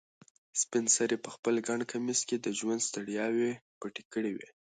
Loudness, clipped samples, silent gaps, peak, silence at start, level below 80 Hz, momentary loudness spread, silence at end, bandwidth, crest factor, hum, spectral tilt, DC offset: -32 LUFS; under 0.1%; 1.39-1.43 s, 3.61-3.81 s, 4.05-4.11 s; -14 dBFS; 0.55 s; -80 dBFS; 11 LU; 0.25 s; 9.6 kHz; 18 dB; none; -2.5 dB/octave; under 0.1%